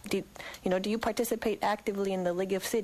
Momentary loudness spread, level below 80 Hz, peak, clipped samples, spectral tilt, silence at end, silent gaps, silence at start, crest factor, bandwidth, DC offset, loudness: 5 LU; -60 dBFS; -14 dBFS; under 0.1%; -4.5 dB/octave; 0 s; none; 0.05 s; 16 dB; 15 kHz; under 0.1%; -31 LUFS